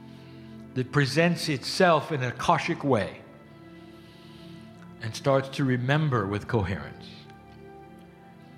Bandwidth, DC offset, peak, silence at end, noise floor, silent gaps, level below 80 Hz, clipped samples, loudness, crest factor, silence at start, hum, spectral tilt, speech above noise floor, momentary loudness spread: 15 kHz; under 0.1%; -6 dBFS; 0.1 s; -49 dBFS; none; -58 dBFS; under 0.1%; -26 LUFS; 22 dB; 0 s; none; -6 dB/octave; 24 dB; 25 LU